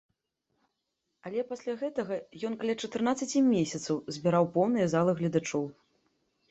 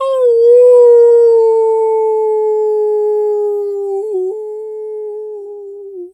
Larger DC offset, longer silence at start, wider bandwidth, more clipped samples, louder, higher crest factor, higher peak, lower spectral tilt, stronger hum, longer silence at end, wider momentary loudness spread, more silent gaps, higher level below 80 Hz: neither; first, 1.25 s vs 0 s; about the same, 8.2 kHz vs 8.4 kHz; neither; second, -30 LUFS vs -11 LUFS; first, 18 dB vs 10 dB; second, -12 dBFS vs -2 dBFS; first, -6 dB/octave vs -4 dB/octave; neither; first, 0.8 s vs 0.05 s; second, 10 LU vs 20 LU; neither; about the same, -70 dBFS vs -72 dBFS